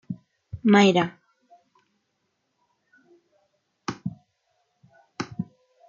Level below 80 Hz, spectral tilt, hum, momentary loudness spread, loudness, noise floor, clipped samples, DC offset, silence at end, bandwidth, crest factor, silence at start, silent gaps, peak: -64 dBFS; -6 dB/octave; none; 22 LU; -23 LUFS; -75 dBFS; under 0.1%; under 0.1%; 0.45 s; 7.4 kHz; 22 dB; 0.1 s; none; -6 dBFS